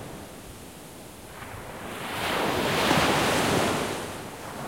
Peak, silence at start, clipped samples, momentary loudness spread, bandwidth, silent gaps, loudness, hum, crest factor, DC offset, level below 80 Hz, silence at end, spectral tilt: -6 dBFS; 0 s; under 0.1%; 21 LU; 16.5 kHz; none; -25 LUFS; none; 22 dB; 0.1%; -52 dBFS; 0 s; -3.5 dB/octave